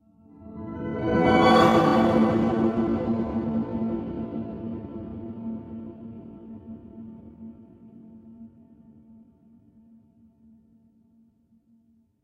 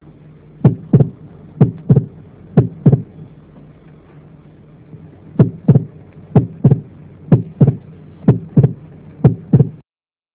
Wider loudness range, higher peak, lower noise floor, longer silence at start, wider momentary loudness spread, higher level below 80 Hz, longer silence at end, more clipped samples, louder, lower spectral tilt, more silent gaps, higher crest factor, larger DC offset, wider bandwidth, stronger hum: first, 24 LU vs 5 LU; second, -6 dBFS vs 0 dBFS; second, -62 dBFS vs under -90 dBFS; second, 0.4 s vs 0.65 s; first, 25 LU vs 6 LU; second, -50 dBFS vs -40 dBFS; first, 3.75 s vs 0.65 s; second, under 0.1% vs 0.2%; second, -24 LUFS vs -15 LUFS; second, -7 dB/octave vs -14.5 dB/octave; neither; first, 22 dB vs 16 dB; neither; first, 11 kHz vs 3.6 kHz; neither